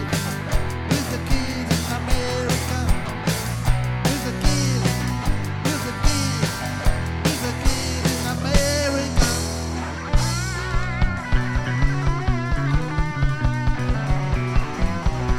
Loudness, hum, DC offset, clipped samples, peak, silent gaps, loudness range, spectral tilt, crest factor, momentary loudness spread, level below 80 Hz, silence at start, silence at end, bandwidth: -23 LUFS; none; under 0.1%; under 0.1%; -2 dBFS; none; 1 LU; -4.5 dB/octave; 18 dB; 4 LU; -26 dBFS; 0 s; 0 s; 18 kHz